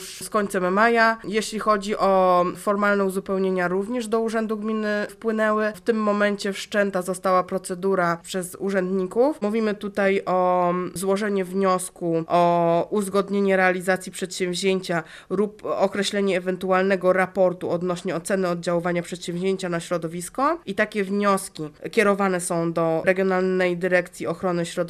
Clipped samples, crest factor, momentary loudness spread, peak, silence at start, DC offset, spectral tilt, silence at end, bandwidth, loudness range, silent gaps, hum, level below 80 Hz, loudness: under 0.1%; 18 dB; 7 LU; -4 dBFS; 0 s; under 0.1%; -5 dB/octave; 0 s; 14.5 kHz; 3 LU; none; none; -58 dBFS; -23 LUFS